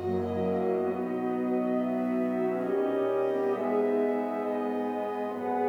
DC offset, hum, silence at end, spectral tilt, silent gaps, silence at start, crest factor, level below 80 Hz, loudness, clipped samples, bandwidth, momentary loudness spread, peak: under 0.1%; none; 0 s; -8.5 dB/octave; none; 0 s; 12 dB; -82 dBFS; -29 LUFS; under 0.1%; 10 kHz; 4 LU; -16 dBFS